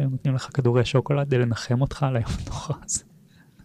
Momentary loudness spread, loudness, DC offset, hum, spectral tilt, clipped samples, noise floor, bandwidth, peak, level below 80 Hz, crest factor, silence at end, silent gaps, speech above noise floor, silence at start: 9 LU; -24 LUFS; under 0.1%; none; -6 dB/octave; under 0.1%; -54 dBFS; 11.5 kHz; -10 dBFS; -42 dBFS; 14 dB; 0.65 s; none; 30 dB; 0 s